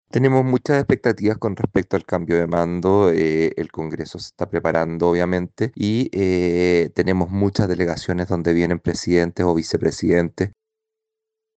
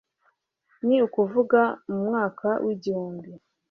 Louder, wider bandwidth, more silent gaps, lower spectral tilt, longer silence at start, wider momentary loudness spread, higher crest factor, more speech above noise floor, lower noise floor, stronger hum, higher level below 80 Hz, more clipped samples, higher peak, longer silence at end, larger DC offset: first, -20 LUFS vs -24 LUFS; first, 8.8 kHz vs 6.6 kHz; neither; about the same, -7 dB/octave vs -8 dB/octave; second, 0.15 s vs 0.85 s; about the same, 8 LU vs 10 LU; about the same, 16 dB vs 18 dB; first, 64 dB vs 46 dB; first, -83 dBFS vs -70 dBFS; neither; first, -46 dBFS vs -72 dBFS; neither; about the same, -4 dBFS vs -6 dBFS; first, 1.05 s vs 0.35 s; neither